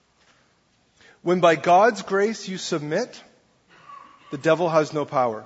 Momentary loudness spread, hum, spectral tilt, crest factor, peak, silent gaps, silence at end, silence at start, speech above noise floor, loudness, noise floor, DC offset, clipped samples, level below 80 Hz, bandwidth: 12 LU; none; -5 dB/octave; 20 dB; -4 dBFS; none; 0 s; 1.25 s; 43 dB; -21 LUFS; -64 dBFS; under 0.1%; under 0.1%; -70 dBFS; 8 kHz